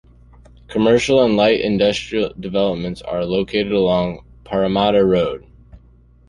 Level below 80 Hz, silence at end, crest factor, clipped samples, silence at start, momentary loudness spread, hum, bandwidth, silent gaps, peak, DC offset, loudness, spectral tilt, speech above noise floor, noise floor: -44 dBFS; 0.5 s; 16 dB; under 0.1%; 0.7 s; 11 LU; 60 Hz at -45 dBFS; 11 kHz; none; -2 dBFS; under 0.1%; -18 LUFS; -6 dB/octave; 32 dB; -49 dBFS